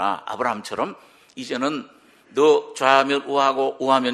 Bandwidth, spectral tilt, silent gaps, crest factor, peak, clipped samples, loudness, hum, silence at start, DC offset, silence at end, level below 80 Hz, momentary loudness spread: 12.5 kHz; -3.5 dB/octave; none; 22 dB; 0 dBFS; under 0.1%; -21 LUFS; none; 0 s; under 0.1%; 0 s; -70 dBFS; 12 LU